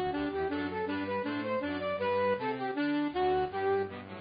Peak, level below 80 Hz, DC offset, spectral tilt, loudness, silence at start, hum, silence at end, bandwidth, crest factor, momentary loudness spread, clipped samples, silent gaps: -20 dBFS; -58 dBFS; under 0.1%; -4 dB/octave; -32 LUFS; 0 s; none; 0 s; 5 kHz; 12 dB; 4 LU; under 0.1%; none